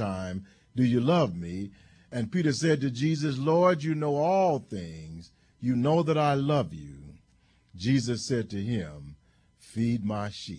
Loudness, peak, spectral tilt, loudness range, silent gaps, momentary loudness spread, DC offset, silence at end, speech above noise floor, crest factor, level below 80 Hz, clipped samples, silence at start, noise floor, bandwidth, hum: -27 LUFS; -12 dBFS; -6.5 dB/octave; 5 LU; none; 16 LU; under 0.1%; 0 s; 37 dB; 16 dB; -58 dBFS; under 0.1%; 0 s; -64 dBFS; 10.5 kHz; none